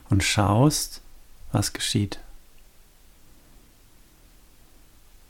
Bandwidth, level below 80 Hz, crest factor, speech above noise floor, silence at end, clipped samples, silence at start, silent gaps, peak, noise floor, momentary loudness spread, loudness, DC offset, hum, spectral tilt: 18 kHz; -46 dBFS; 20 dB; 31 dB; 2.9 s; under 0.1%; 0.1 s; none; -8 dBFS; -53 dBFS; 14 LU; -23 LUFS; under 0.1%; none; -4.5 dB/octave